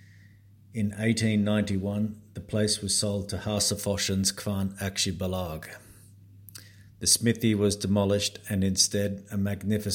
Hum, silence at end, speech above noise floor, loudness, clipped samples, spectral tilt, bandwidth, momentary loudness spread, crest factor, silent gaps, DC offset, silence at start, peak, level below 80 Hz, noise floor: none; 0 s; 27 dB; -27 LUFS; under 0.1%; -4 dB/octave; 17 kHz; 15 LU; 22 dB; none; under 0.1%; 0.75 s; -6 dBFS; -56 dBFS; -54 dBFS